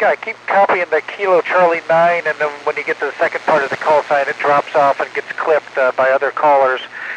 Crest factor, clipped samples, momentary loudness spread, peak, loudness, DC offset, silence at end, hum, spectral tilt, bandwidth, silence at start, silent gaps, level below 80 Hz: 12 dB; under 0.1%; 7 LU; -2 dBFS; -15 LUFS; under 0.1%; 0 s; none; -4.5 dB/octave; 9.8 kHz; 0 s; none; -70 dBFS